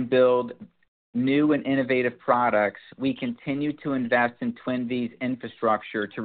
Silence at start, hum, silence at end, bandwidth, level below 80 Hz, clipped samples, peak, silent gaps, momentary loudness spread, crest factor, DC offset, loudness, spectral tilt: 0 s; none; 0 s; 4.6 kHz; -66 dBFS; under 0.1%; -6 dBFS; 0.88-1.13 s; 9 LU; 20 dB; under 0.1%; -25 LUFS; -4.5 dB/octave